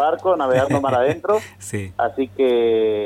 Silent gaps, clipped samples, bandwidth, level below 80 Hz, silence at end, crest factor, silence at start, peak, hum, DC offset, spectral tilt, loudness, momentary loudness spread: none; under 0.1%; 15 kHz; -54 dBFS; 0 s; 14 dB; 0 s; -6 dBFS; 50 Hz at -45 dBFS; under 0.1%; -6 dB/octave; -19 LUFS; 8 LU